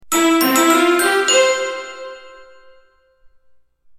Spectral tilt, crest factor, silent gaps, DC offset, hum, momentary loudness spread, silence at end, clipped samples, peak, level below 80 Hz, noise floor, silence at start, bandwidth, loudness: -1 dB/octave; 18 dB; none; under 0.1%; none; 18 LU; 1.55 s; under 0.1%; 0 dBFS; -62 dBFS; -53 dBFS; 0.05 s; 19 kHz; -14 LUFS